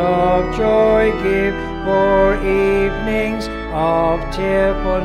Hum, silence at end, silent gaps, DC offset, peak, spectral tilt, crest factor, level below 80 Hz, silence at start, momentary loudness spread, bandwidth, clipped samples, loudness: none; 0 s; none; under 0.1%; -2 dBFS; -7 dB/octave; 12 dB; -28 dBFS; 0 s; 7 LU; 12.5 kHz; under 0.1%; -16 LUFS